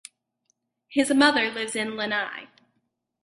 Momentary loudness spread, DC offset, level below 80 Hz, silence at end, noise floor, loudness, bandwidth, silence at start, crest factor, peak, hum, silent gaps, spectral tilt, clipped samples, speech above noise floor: 11 LU; under 0.1%; -70 dBFS; 0.8 s; -76 dBFS; -24 LUFS; 11.5 kHz; 0.9 s; 22 dB; -4 dBFS; none; none; -2.5 dB/octave; under 0.1%; 52 dB